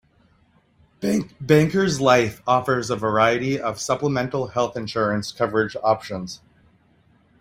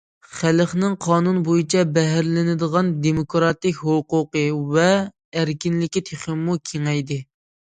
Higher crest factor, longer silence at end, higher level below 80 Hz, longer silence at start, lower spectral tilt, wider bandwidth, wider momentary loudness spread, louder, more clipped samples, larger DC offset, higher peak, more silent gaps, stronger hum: about the same, 20 dB vs 18 dB; first, 1.05 s vs 0.5 s; about the same, -54 dBFS vs -54 dBFS; first, 1 s vs 0.3 s; about the same, -5.5 dB/octave vs -6 dB/octave; first, 16 kHz vs 9.4 kHz; about the same, 8 LU vs 6 LU; about the same, -21 LUFS vs -21 LUFS; neither; neither; about the same, -2 dBFS vs -2 dBFS; second, none vs 5.25-5.32 s; neither